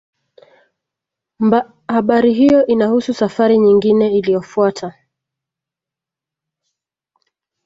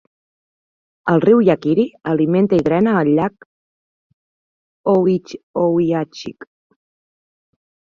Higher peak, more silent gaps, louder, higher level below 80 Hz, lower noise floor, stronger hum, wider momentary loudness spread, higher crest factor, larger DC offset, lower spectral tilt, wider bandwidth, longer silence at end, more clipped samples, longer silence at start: about the same, -2 dBFS vs -2 dBFS; second, none vs 3.46-4.84 s, 5.43-5.54 s; about the same, -14 LUFS vs -16 LUFS; about the same, -56 dBFS vs -58 dBFS; second, -86 dBFS vs under -90 dBFS; neither; second, 8 LU vs 12 LU; about the same, 16 dB vs 16 dB; neither; second, -7 dB/octave vs -8.5 dB/octave; about the same, 7.8 kHz vs 7.2 kHz; first, 2.75 s vs 1.6 s; neither; first, 1.4 s vs 1.05 s